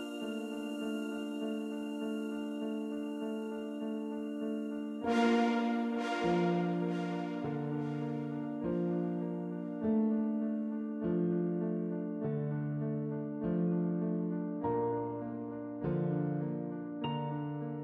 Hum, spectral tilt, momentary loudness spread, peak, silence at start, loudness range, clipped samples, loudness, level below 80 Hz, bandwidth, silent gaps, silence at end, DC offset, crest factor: none; -8 dB/octave; 8 LU; -18 dBFS; 0 s; 5 LU; under 0.1%; -35 LUFS; -68 dBFS; 12 kHz; none; 0 s; under 0.1%; 16 dB